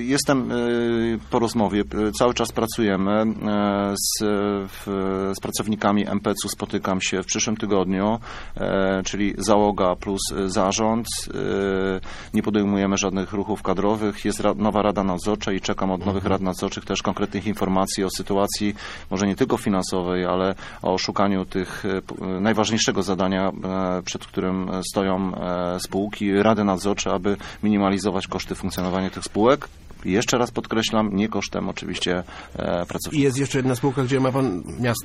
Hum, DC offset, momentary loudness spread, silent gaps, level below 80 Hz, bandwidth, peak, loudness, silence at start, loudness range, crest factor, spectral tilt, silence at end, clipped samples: none; under 0.1%; 6 LU; none; -44 dBFS; 14.5 kHz; -2 dBFS; -23 LUFS; 0 s; 2 LU; 22 dB; -5 dB/octave; 0 s; under 0.1%